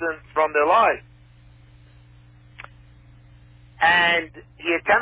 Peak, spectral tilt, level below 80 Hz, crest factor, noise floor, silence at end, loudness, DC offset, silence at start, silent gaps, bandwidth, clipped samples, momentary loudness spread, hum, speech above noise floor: -4 dBFS; -7 dB/octave; -54 dBFS; 18 dB; -50 dBFS; 0 s; -20 LUFS; under 0.1%; 0 s; none; 4 kHz; under 0.1%; 20 LU; 60 Hz at -50 dBFS; 29 dB